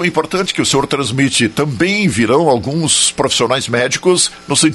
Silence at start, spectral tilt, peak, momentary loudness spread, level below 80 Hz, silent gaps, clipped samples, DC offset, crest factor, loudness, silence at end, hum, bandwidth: 0 s; -3.5 dB/octave; 0 dBFS; 4 LU; -46 dBFS; none; under 0.1%; under 0.1%; 14 dB; -13 LUFS; 0 s; none; 12 kHz